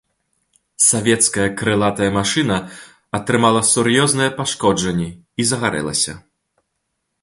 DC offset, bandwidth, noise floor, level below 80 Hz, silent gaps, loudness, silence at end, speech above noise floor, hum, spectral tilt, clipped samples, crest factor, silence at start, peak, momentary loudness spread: under 0.1%; 12 kHz; -74 dBFS; -48 dBFS; none; -17 LUFS; 1.05 s; 56 dB; none; -3.5 dB/octave; under 0.1%; 18 dB; 0.8 s; 0 dBFS; 9 LU